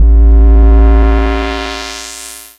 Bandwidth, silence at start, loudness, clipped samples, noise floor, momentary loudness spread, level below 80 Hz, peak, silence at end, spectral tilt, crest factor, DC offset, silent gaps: 11.5 kHz; 0 s; -10 LUFS; under 0.1%; -29 dBFS; 15 LU; -8 dBFS; 0 dBFS; 0.2 s; -6 dB/octave; 8 dB; under 0.1%; none